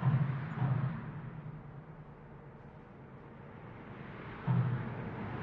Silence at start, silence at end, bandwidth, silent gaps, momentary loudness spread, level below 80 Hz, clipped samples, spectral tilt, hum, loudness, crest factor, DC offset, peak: 0 s; 0 s; 4.3 kHz; none; 19 LU; -60 dBFS; under 0.1%; -10.5 dB/octave; none; -37 LUFS; 18 dB; under 0.1%; -20 dBFS